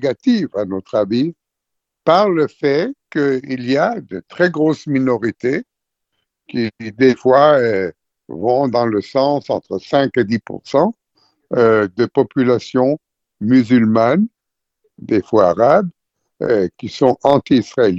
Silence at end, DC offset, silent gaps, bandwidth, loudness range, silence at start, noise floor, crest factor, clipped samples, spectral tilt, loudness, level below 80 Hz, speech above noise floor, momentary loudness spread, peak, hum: 0 s; under 0.1%; none; 7.8 kHz; 3 LU; 0 s; -79 dBFS; 16 dB; under 0.1%; -7 dB/octave; -16 LUFS; -56 dBFS; 64 dB; 10 LU; 0 dBFS; none